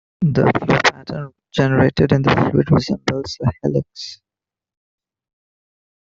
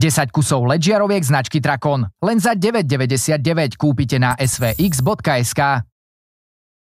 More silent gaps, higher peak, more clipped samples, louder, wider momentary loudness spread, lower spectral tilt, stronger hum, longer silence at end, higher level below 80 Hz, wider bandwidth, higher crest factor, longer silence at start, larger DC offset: neither; about the same, -2 dBFS vs -2 dBFS; neither; about the same, -17 LUFS vs -17 LUFS; first, 14 LU vs 3 LU; first, -6.5 dB/octave vs -5 dB/octave; neither; first, 2 s vs 1.1 s; about the same, -46 dBFS vs -44 dBFS; second, 7.6 kHz vs 15.5 kHz; about the same, 18 dB vs 16 dB; first, 0.2 s vs 0 s; neither